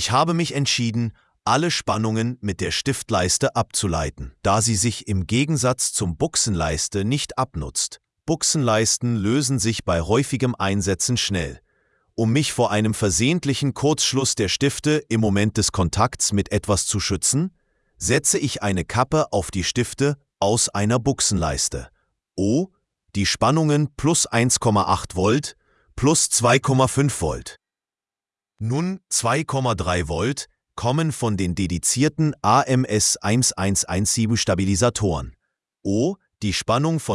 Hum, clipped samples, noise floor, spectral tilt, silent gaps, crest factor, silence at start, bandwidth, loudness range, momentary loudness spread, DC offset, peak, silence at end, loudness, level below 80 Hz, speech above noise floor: none; under 0.1%; under -90 dBFS; -4 dB/octave; none; 18 dB; 0 s; 12 kHz; 3 LU; 8 LU; under 0.1%; -2 dBFS; 0 s; -21 LUFS; -44 dBFS; over 69 dB